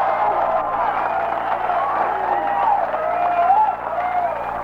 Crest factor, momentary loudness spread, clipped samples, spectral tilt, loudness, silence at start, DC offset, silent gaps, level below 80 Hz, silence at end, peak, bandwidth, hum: 14 dB; 5 LU; under 0.1%; -6 dB/octave; -20 LUFS; 0 s; under 0.1%; none; -50 dBFS; 0 s; -6 dBFS; 6.6 kHz; none